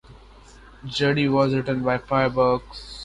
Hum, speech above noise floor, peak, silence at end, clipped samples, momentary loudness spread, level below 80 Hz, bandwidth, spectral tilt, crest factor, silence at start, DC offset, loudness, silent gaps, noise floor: none; 25 dB; -6 dBFS; 0 s; under 0.1%; 10 LU; -48 dBFS; 11 kHz; -6.5 dB/octave; 16 dB; 0.1 s; under 0.1%; -22 LUFS; none; -47 dBFS